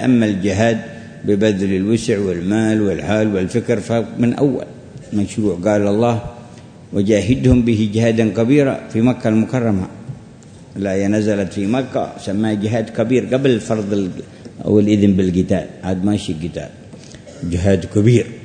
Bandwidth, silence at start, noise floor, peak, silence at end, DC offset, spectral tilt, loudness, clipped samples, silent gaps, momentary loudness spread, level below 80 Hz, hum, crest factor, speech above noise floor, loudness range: 9.6 kHz; 0 s; -39 dBFS; 0 dBFS; 0 s; under 0.1%; -7 dB/octave; -17 LUFS; under 0.1%; none; 14 LU; -40 dBFS; none; 16 dB; 23 dB; 3 LU